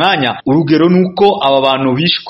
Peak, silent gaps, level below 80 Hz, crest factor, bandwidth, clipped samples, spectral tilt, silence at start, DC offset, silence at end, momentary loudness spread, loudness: 0 dBFS; none; -50 dBFS; 12 dB; 5.8 kHz; 0.1%; -8 dB/octave; 0 s; under 0.1%; 0 s; 3 LU; -11 LUFS